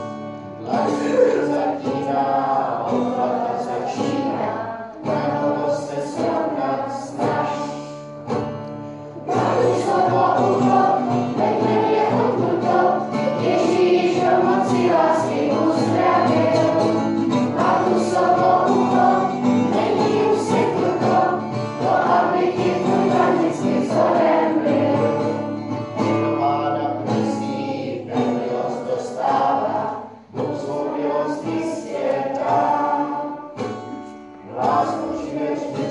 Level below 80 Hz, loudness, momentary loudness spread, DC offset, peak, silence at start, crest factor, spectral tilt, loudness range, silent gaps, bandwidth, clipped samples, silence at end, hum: -60 dBFS; -20 LUFS; 10 LU; under 0.1%; -4 dBFS; 0 s; 16 dB; -6.5 dB/octave; 6 LU; none; 11.5 kHz; under 0.1%; 0 s; none